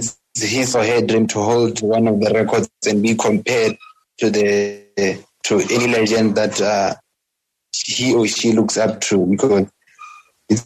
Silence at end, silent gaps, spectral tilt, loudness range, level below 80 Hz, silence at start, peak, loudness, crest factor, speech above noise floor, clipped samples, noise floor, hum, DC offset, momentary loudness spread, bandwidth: 0 s; none; -4 dB/octave; 2 LU; -58 dBFS; 0 s; -4 dBFS; -17 LUFS; 14 dB; 60 dB; under 0.1%; -77 dBFS; none; under 0.1%; 7 LU; 13.5 kHz